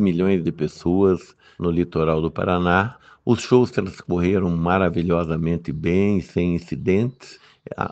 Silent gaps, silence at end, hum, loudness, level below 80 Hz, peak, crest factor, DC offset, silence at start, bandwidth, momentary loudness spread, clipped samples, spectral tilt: none; 0 s; none; -21 LUFS; -44 dBFS; 0 dBFS; 20 dB; under 0.1%; 0 s; 8.2 kHz; 8 LU; under 0.1%; -7.5 dB/octave